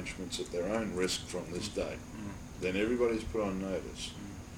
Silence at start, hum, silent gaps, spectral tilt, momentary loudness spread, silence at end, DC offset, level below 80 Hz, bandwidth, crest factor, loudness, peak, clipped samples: 0 s; none; none; -4.5 dB/octave; 11 LU; 0 s; under 0.1%; -52 dBFS; 18 kHz; 18 dB; -35 LUFS; -18 dBFS; under 0.1%